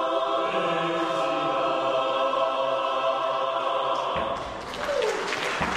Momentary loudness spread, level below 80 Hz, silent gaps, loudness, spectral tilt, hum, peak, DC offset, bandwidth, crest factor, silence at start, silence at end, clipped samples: 4 LU; -54 dBFS; none; -26 LUFS; -4 dB/octave; none; -14 dBFS; under 0.1%; 13.5 kHz; 12 dB; 0 s; 0 s; under 0.1%